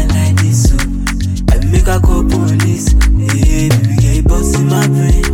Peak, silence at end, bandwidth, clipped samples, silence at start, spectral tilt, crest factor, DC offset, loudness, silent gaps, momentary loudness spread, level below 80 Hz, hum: 0 dBFS; 0 s; 17 kHz; under 0.1%; 0 s; -6 dB/octave; 10 dB; under 0.1%; -12 LUFS; none; 3 LU; -14 dBFS; none